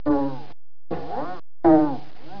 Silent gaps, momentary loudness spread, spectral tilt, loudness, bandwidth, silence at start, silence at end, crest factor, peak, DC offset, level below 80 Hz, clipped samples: none; 19 LU; -9.5 dB/octave; -22 LUFS; 5.4 kHz; 0.05 s; 0 s; 18 dB; -6 dBFS; 5%; -50 dBFS; under 0.1%